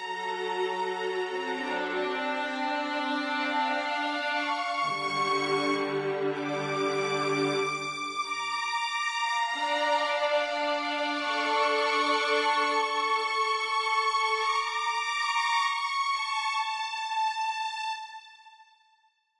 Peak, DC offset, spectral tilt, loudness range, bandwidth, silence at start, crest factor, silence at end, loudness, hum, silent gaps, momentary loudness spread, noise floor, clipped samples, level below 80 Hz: -14 dBFS; under 0.1%; -2.5 dB/octave; 4 LU; 11.5 kHz; 0 s; 16 dB; 0.75 s; -28 LUFS; none; none; 6 LU; -68 dBFS; under 0.1%; -86 dBFS